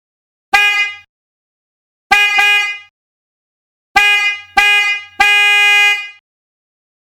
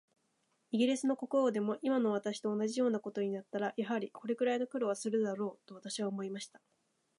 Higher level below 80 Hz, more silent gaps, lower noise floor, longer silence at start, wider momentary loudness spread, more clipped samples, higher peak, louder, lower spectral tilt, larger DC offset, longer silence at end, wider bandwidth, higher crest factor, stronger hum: first, -48 dBFS vs -88 dBFS; first, 1.09-2.10 s, 2.90-3.95 s vs none; first, under -90 dBFS vs -78 dBFS; second, 0.55 s vs 0.7 s; about the same, 11 LU vs 9 LU; neither; first, 0 dBFS vs -20 dBFS; first, -10 LUFS vs -35 LUFS; second, 1.5 dB/octave vs -5 dB/octave; neither; first, 0.95 s vs 0.7 s; first, 18.5 kHz vs 11.5 kHz; about the same, 14 dB vs 16 dB; neither